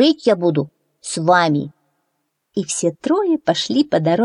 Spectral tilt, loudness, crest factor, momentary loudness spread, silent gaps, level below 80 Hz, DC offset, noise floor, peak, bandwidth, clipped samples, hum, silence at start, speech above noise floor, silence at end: -5 dB/octave; -18 LUFS; 16 dB; 13 LU; none; -64 dBFS; under 0.1%; -72 dBFS; -2 dBFS; 11 kHz; under 0.1%; none; 0 s; 55 dB; 0 s